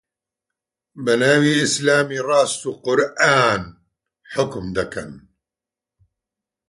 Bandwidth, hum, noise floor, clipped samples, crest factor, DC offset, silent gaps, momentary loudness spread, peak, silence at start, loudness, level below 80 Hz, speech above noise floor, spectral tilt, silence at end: 11.5 kHz; none; -88 dBFS; under 0.1%; 20 dB; under 0.1%; none; 14 LU; -2 dBFS; 0.95 s; -18 LUFS; -52 dBFS; 70 dB; -4 dB/octave; 1.5 s